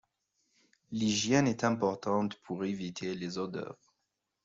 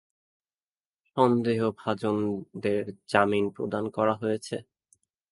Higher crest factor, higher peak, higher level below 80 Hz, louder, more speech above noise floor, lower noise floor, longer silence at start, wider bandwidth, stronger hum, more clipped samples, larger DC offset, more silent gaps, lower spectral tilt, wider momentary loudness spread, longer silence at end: about the same, 20 dB vs 24 dB; second, -14 dBFS vs -6 dBFS; second, -70 dBFS vs -64 dBFS; second, -32 LUFS vs -27 LUFS; second, 52 dB vs over 63 dB; second, -84 dBFS vs under -90 dBFS; second, 0.9 s vs 1.15 s; second, 7.8 kHz vs 11.5 kHz; neither; neither; neither; neither; second, -4.5 dB/octave vs -6.5 dB/octave; about the same, 11 LU vs 9 LU; about the same, 0.7 s vs 0.7 s